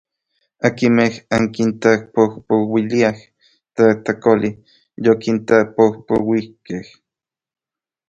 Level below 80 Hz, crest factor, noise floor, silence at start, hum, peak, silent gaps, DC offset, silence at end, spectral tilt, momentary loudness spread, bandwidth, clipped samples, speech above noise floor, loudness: -54 dBFS; 18 dB; -89 dBFS; 0.65 s; none; 0 dBFS; none; under 0.1%; 1.25 s; -6.5 dB/octave; 10 LU; 8 kHz; under 0.1%; 73 dB; -17 LUFS